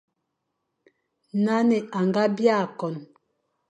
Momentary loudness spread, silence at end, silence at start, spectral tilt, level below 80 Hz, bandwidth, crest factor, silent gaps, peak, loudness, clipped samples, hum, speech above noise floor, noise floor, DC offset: 11 LU; 0.65 s; 1.35 s; -7 dB/octave; -78 dBFS; 8.6 kHz; 18 dB; none; -8 dBFS; -24 LUFS; under 0.1%; none; 56 dB; -79 dBFS; under 0.1%